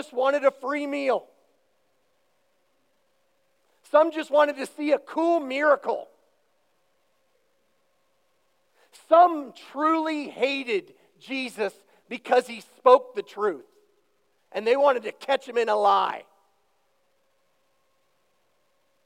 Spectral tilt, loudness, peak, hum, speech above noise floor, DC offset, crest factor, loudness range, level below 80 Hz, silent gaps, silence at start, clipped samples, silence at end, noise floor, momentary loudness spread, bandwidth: -3.5 dB/octave; -24 LUFS; -4 dBFS; none; 47 dB; under 0.1%; 24 dB; 6 LU; under -90 dBFS; none; 0 s; under 0.1%; 2.85 s; -71 dBFS; 15 LU; 13.5 kHz